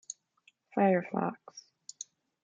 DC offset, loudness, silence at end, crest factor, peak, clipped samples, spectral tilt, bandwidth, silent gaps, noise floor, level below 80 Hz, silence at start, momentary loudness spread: under 0.1%; -31 LUFS; 0.85 s; 20 dB; -14 dBFS; under 0.1%; -6 dB/octave; 9.4 kHz; none; -69 dBFS; -82 dBFS; 0.1 s; 22 LU